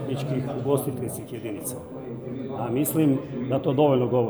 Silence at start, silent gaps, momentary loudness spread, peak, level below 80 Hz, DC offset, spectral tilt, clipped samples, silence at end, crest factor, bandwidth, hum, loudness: 0 s; none; 13 LU; -8 dBFS; -60 dBFS; under 0.1%; -6.5 dB/octave; under 0.1%; 0 s; 18 dB; over 20 kHz; none; -26 LUFS